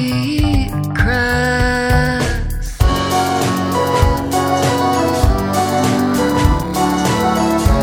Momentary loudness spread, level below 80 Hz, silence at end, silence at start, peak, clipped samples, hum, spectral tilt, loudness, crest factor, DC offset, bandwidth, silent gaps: 3 LU; -22 dBFS; 0 s; 0 s; 0 dBFS; under 0.1%; none; -5.5 dB/octave; -15 LUFS; 14 dB; under 0.1%; 18.5 kHz; none